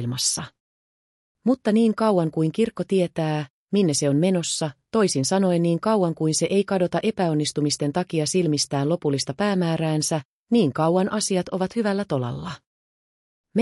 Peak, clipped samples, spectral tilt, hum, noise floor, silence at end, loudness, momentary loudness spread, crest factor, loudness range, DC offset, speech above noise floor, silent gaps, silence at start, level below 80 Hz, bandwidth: -10 dBFS; under 0.1%; -5 dB/octave; none; under -90 dBFS; 0 s; -23 LUFS; 6 LU; 14 dB; 2 LU; under 0.1%; over 68 dB; 0.60-1.35 s, 3.50-3.67 s, 10.25-10.47 s, 12.66-13.44 s; 0 s; -62 dBFS; 13.5 kHz